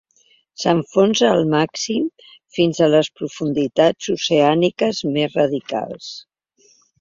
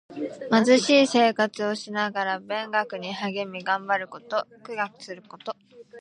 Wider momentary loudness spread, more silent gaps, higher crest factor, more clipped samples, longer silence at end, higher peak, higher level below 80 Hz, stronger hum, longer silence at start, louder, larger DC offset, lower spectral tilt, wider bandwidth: second, 11 LU vs 19 LU; neither; about the same, 16 dB vs 18 dB; neither; first, 0.8 s vs 0 s; first, -2 dBFS vs -6 dBFS; first, -60 dBFS vs -78 dBFS; neither; first, 0.6 s vs 0.1 s; first, -18 LUFS vs -24 LUFS; neither; about the same, -5 dB/octave vs -4 dB/octave; second, 7.6 kHz vs 10.5 kHz